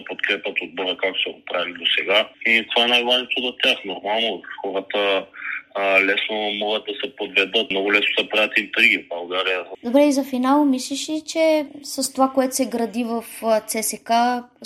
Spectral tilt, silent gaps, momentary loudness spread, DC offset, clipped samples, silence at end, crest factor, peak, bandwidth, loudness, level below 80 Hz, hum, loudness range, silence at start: -1.5 dB/octave; none; 9 LU; under 0.1%; under 0.1%; 0 s; 20 dB; -2 dBFS; 15.5 kHz; -20 LUFS; -70 dBFS; none; 3 LU; 0 s